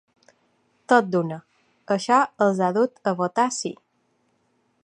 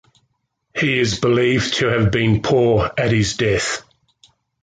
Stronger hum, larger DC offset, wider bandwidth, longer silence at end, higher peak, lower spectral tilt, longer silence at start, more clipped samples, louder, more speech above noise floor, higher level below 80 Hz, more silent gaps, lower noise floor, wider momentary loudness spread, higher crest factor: neither; neither; first, 11 kHz vs 9.4 kHz; first, 1.15 s vs 0.8 s; first, -2 dBFS vs -6 dBFS; about the same, -5 dB/octave vs -5 dB/octave; first, 0.9 s vs 0.75 s; neither; second, -22 LUFS vs -17 LUFS; second, 47 dB vs 53 dB; second, -76 dBFS vs -40 dBFS; neither; about the same, -68 dBFS vs -70 dBFS; first, 11 LU vs 5 LU; first, 22 dB vs 14 dB